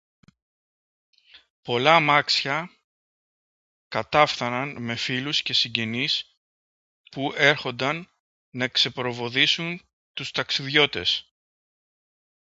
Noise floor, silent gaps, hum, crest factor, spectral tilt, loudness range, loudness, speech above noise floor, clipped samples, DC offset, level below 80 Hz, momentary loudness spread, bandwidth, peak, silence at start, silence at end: under -90 dBFS; 1.50-1.63 s, 2.84-3.90 s, 6.37-7.04 s, 8.20-8.52 s, 9.93-10.14 s; none; 26 dB; -3.5 dB/octave; 3 LU; -23 LUFS; over 66 dB; under 0.1%; under 0.1%; -64 dBFS; 13 LU; 8 kHz; 0 dBFS; 1.35 s; 1.3 s